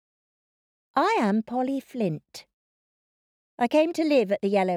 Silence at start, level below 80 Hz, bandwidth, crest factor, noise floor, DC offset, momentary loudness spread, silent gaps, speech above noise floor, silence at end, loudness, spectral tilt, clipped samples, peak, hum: 0.95 s; -74 dBFS; 15.5 kHz; 18 dB; under -90 dBFS; under 0.1%; 9 LU; 2.54-3.58 s; over 66 dB; 0 s; -25 LUFS; -6.5 dB/octave; under 0.1%; -10 dBFS; none